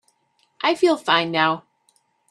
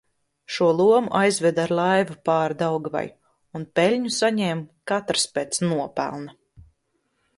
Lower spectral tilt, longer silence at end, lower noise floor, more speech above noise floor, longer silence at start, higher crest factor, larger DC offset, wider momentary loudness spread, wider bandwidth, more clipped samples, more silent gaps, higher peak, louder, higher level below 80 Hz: about the same, -4.5 dB/octave vs -4.5 dB/octave; second, 0.7 s vs 1.05 s; second, -66 dBFS vs -72 dBFS; second, 46 dB vs 50 dB; about the same, 0.6 s vs 0.5 s; about the same, 22 dB vs 18 dB; neither; second, 6 LU vs 13 LU; about the same, 12 kHz vs 11.5 kHz; neither; neither; first, -2 dBFS vs -6 dBFS; about the same, -20 LUFS vs -22 LUFS; second, -72 dBFS vs -64 dBFS